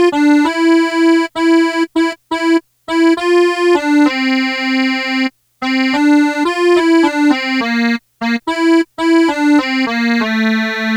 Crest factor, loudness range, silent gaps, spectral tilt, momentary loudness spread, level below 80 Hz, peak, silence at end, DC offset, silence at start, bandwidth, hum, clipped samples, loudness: 12 dB; 1 LU; none; -4 dB/octave; 6 LU; -56 dBFS; 0 dBFS; 0 s; under 0.1%; 0 s; 11 kHz; none; under 0.1%; -13 LUFS